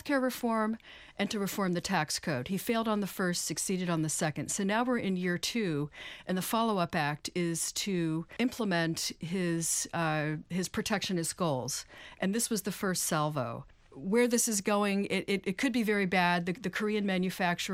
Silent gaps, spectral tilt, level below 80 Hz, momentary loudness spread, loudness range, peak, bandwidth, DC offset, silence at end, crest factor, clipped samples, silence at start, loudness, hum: none; -4 dB/octave; -62 dBFS; 6 LU; 3 LU; -14 dBFS; 16 kHz; under 0.1%; 0 s; 18 dB; under 0.1%; 0.05 s; -31 LUFS; none